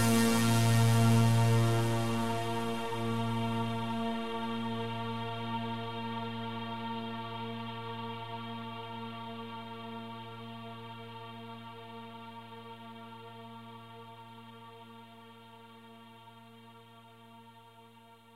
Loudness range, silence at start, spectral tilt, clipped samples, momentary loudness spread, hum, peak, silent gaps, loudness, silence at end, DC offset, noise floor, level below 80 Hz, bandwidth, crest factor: 22 LU; 0 s; -5.5 dB/octave; under 0.1%; 26 LU; none; -14 dBFS; none; -33 LUFS; 0 s; under 0.1%; -57 dBFS; -62 dBFS; 15.5 kHz; 20 dB